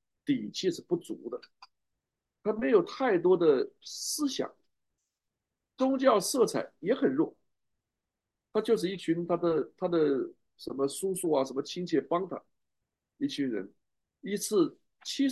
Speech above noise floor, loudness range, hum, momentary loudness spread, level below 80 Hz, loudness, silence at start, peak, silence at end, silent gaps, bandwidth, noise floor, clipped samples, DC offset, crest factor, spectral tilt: 59 dB; 4 LU; none; 14 LU; -76 dBFS; -30 LUFS; 0.25 s; -10 dBFS; 0 s; none; 12.5 kHz; -88 dBFS; under 0.1%; under 0.1%; 22 dB; -4.5 dB/octave